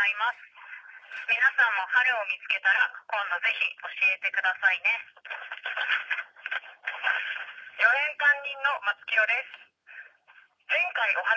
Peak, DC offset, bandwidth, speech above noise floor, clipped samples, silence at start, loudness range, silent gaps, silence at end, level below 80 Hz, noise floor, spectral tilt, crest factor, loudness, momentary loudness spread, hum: -10 dBFS; under 0.1%; 8 kHz; 32 dB; under 0.1%; 0 s; 3 LU; none; 0 s; -90 dBFS; -59 dBFS; 1 dB/octave; 18 dB; -25 LUFS; 15 LU; none